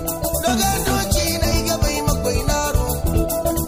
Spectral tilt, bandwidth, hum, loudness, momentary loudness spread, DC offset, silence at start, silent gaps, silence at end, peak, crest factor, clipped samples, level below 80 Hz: -4 dB/octave; 16 kHz; none; -19 LUFS; 3 LU; under 0.1%; 0 s; none; 0 s; -4 dBFS; 14 dB; under 0.1%; -24 dBFS